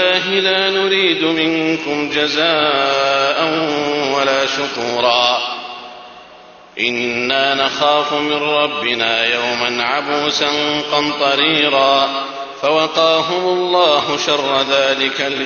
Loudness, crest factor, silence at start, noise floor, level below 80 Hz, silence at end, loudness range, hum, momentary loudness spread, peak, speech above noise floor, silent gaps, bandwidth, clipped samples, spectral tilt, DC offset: -15 LUFS; 16 dB; 0 s; -41 dBFS; -58 dBFS; 0 s; 3 LU; none; 6 LU; 0 dBFS; 25 dB; none; 7 kHz; under 0.1%; -3 dB/octave; under 0.1%